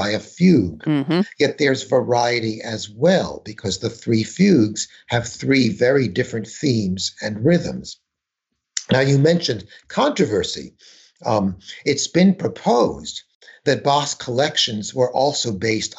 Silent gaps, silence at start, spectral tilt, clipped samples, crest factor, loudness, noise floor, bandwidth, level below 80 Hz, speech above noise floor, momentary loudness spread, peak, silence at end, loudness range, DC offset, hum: 13.35-13.41 s; 0 s; -5 dB/octave; under 0.1%; 14 dB; -19 LUFS; -82 dBFS; 8.2 kHz; -54 dBFS; 63 dB; 12 LU; -6 dBFS; 0.1 s; 2 LU; under 0.1%; none